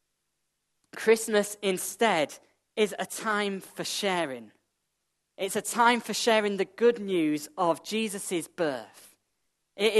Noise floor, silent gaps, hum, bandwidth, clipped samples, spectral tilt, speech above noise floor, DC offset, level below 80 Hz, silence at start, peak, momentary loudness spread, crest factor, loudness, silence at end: -80 dBFS; none; none; 13 kHz; under 0.1%; -3 dB/octave; 52 dB; under 0.1%; -80 dBFS; 0.95 s; -8 dBFS; 11 LU; 22 dB; -28 LUFS; 0 s